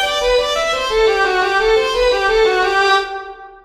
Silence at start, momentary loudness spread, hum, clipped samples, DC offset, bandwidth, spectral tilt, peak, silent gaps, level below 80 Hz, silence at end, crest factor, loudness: 0 s; 3 LU; none; under 0.1%; under 0.1%; 14 kHz; -2 dB/octave; -2 dBFS; none; -36 dBFS; 0.1 s; 12 dB; -14 LUFS